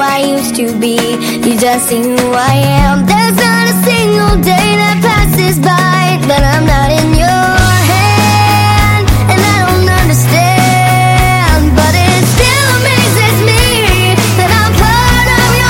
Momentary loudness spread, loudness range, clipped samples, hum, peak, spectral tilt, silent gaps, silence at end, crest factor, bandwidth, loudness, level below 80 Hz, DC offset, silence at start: 3 LU; 1 LU; 0.4%; none; 0 dBFS; -4.5 dB/octave; none; 0 s; 8 dB; 17 kHz; -8 LUFS; -18 dBFS; under 0.1%; 0 s